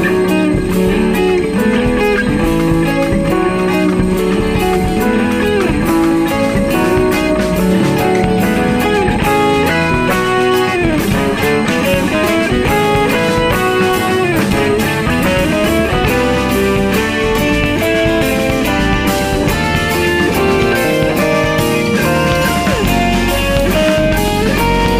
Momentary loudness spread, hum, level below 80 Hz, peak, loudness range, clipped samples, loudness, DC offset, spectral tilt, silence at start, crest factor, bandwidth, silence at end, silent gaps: 1 LU; none; -26 dBFS; -2 dBFS; 1 LU; under 0.1%; -13 LUFS; under 0.1%; -5.5 dB/octave; 0 s; 10 dB; 15.5 kHz; 0 s; none